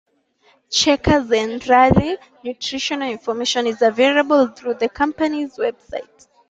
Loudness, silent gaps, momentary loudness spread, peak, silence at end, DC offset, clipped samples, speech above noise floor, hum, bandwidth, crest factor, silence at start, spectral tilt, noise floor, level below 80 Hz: -18 LUFS; none; 12 LU; -2 dBFS; 0.45 s; under 0.1%; under 0.1%; 40 dB; none; 9.2 kHz; 16 dB; 0.7 s; -4 dB/octave; -58 dBFS; -42 dBFS